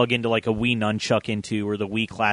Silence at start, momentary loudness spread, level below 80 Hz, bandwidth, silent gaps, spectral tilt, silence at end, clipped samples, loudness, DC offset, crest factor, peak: 0 s; 4 LU; -52 dBFS; 10.5 kHz; none; -5.5 dB/octave; 0 s; under 0.1%; -24 LUFS; under 0.1%; 18 dB; -4 dBFS